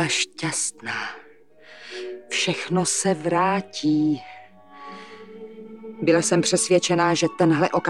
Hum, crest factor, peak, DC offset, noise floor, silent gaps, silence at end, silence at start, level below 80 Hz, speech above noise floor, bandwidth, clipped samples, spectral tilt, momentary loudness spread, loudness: none; 18 dB; -6 dBFS; 0.2%; -51 dBFS; none; 0 s; 0 s; -70 dBFS; 29 dB; 12.5 kHz; under 0.1%; -4 dB/octave; 22 LU; -22 LUFS